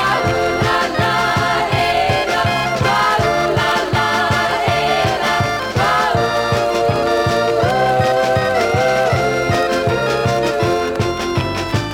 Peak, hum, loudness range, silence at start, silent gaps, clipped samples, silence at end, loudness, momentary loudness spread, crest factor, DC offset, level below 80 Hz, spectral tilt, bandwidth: -2 dBFS; none; 1 LU; 0 s; none; under 0.1%; 0 s; -16 LUFS; 2 LU; 14 dB; under 0.1%; -38 dBFS; -5 dB/octave; 17.5 kHz